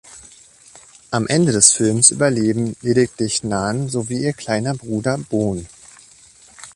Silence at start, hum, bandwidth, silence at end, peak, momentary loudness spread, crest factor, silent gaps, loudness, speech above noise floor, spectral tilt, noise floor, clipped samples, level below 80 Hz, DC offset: 0.05 s; none; 13.5 kHz; 0.05 s; 0 dBFS; 11 LU; 20 dB; none; -17 LUFS; 29 dB; -4 dB/octave; -47 dBFS; under 0.1%; -50 dBFS; under 0.1%